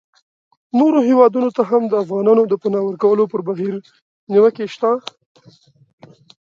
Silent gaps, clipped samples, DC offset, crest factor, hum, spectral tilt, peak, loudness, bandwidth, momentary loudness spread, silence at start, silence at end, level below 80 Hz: 4.02-4.27 s; under 0.1%; under 0.1%; 16 dB; none; -8 dB/octave; 0 dBFS; -16 LUFS; 7.2 kHz; 10 LU; 0.75 s; 1.5 s; -70 dBFS